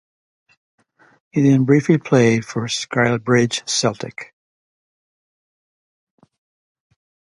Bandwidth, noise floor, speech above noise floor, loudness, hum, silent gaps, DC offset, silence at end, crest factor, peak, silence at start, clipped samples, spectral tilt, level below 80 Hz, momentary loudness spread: 11.5 kHz; under -90 dBFS; over 73 dB; -17 LUFS; none; none; under 0.1%; 3.15 s; 20 dB; 0 dBFS; 1.35 s; under 0.1%; -5 dB/octave; -60 dBFS; 15 LU